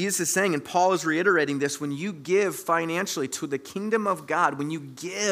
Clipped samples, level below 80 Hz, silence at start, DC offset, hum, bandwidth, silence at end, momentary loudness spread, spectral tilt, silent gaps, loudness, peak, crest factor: under 0.1%; -76 dBFS; 0 s; under 0.1%; none; 16 kHz; 0 s; 9 LU; -3.5 dB/octave; none; -25 LUFS; -8 dBFS; 18 dB